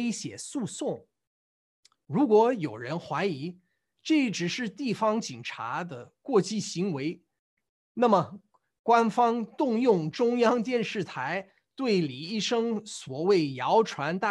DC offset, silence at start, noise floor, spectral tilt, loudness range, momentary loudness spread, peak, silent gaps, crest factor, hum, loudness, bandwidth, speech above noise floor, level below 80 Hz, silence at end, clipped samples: under 0.1%; 0 s; under -90 dBFS; -5 dB/octave; 4 LU; 12 LU; -10 dBFS; 1.27-1.83 s, 7.39-7.57 s, 7.69-7.95 s, 8.79-8.84 s; 18 dB; none; -28 LUFS; 11.5 kHz; over 63 dB; -76 dBFS; 0 s; under 0.1%